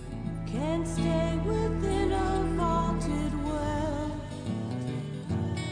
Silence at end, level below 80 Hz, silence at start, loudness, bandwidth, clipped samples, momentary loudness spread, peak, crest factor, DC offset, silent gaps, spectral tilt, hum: 0 s; -38 dBFS; 0 s; -30 LUFS; 10 kHz; under 0.1%; 7 LU; -16 dBFS; 14 dB; under 0.1%; none; -7 dB/octave; none